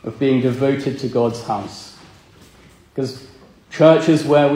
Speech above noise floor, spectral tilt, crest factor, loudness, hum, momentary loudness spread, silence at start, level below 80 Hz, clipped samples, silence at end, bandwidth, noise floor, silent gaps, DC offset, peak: 31 dB; -7 dB/octave; 18 dB; -17 LUFS; none; 21 LU; 0.05 s; -56 dBFS; under 0.1%; 0 s; 15 kHz; -48 dBFS; none; under 0.1%; 0 dBFS